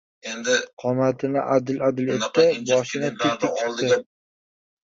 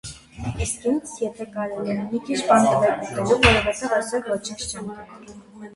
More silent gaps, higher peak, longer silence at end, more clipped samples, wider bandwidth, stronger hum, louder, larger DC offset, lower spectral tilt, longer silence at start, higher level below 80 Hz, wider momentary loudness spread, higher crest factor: first, 0.73-0.77 s vs none; second, -4 dBFS vs 0 dBFS; first, 0.85 s vs 0 s; neither; second, 7.8 kHz vs 11.5 kHz; neither; about the same, -22 LUFS vs -22 LUFS; neither; about the same, -4.5 dB/octave vs -4 dB/octave; first, 0.25 s vs 0.05 s; second, -66 dBFS vs -40 dBFS; second, 6 LU vs 17 LU; about the same, 18 dB vs 22 dB